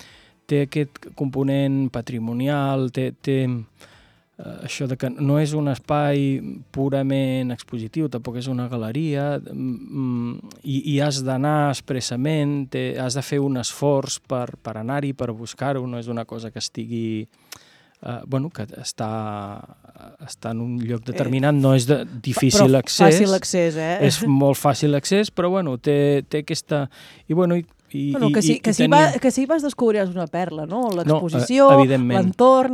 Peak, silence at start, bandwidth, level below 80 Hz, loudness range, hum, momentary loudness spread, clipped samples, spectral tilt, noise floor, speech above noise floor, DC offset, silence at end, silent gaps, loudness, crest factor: 0 dBFS; 0.5 s; 15 kHz; -58 dBFS; 11 LU; none; 15 LU; under 0.1%; -6 dB/octave; -47 dBFS; 27 dB; under 0.1%; 0 s; none; -21 LUFS; 20 dB